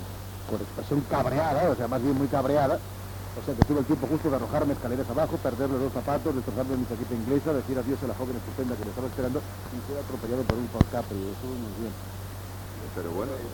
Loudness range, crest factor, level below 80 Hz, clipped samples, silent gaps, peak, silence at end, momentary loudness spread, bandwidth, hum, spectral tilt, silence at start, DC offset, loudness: 5 LU; 26 dB; -42 dBFS; under 0.1%; none; -2 dBFS; 0 s; 12 LU; 19 kHz; none; -7 dB/octave; 0 s; under 0.1%; -29 LUFS